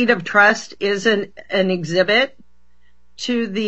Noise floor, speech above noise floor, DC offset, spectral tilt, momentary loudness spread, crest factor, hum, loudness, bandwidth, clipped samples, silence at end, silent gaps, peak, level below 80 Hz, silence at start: -60 dBFS; 42 dB; 0.8%; -4.5 dB/octave; 10 LU; 18 dB; none; -17 LUFS; 8.2 kHz; under 0.1%; 0 s; none; 0 dBFS; -60 dBFS; 0 s